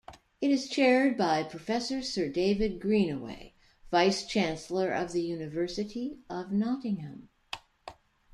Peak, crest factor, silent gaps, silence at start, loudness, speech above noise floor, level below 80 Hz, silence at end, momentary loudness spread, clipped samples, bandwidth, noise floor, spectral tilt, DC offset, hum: -12 dBFS; 18 dB; none; 0.1 s; -30 LUFS; 22 dB; -56 dBFS; 0.4 s; 17 LU; under 0.1%; 11.5 kHz; -51 dBFS; -5 dB/octave; under 0.1%; none